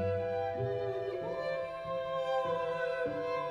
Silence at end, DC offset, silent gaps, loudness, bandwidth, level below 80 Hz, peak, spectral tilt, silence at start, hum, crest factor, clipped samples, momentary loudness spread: 0 s; under 0.1%; none; -35 LUFS; 9.8 kHz; -64 dBFS; -22 dBFS; -7 dB/octave; 0 s; none; 12 dB; under 0.1%; 4 LU